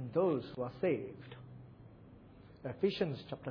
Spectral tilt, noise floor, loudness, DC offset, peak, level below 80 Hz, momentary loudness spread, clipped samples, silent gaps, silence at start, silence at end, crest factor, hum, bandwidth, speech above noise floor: -6 dB/octave; -57 dBFS; -37 LUFS; under 0.1%; -20 dBFS; -68 dBFS; 24 LU; under 0.1%; none; 0 s; 0 s; 18 dB; none; 5.4 kHz; 21 dB